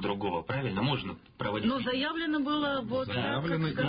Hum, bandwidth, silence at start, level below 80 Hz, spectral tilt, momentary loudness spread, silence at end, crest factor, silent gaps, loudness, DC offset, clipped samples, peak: none; 5.2 kHz; 0 s; -56 dBFS; -10 dB/octave; 4 LU; 0 s; 14 dB; none; -31 LUFS; under 0.1%; under 0.1%; -18 dBFS